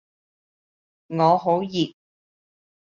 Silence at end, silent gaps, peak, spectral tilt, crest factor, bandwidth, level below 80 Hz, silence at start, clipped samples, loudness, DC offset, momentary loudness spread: 1 s; none; -4 dBFS; -5.5 dB/octave; 20 dB; 7.2 kHz; -68 dBFS; 1.1 s; under 0.1%; -22 LUFS; under 0.1%; 10 LU